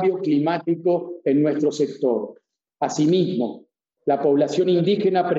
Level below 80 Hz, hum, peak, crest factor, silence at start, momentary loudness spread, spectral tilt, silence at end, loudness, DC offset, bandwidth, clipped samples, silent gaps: -76 dBFS; none; -8 dBFS; 14 dB; 0 s; 8 LU; -6.5 dB/octave; 0 s; -21 LUFS; under 0.1%; 8 kHz; under 0.1%; none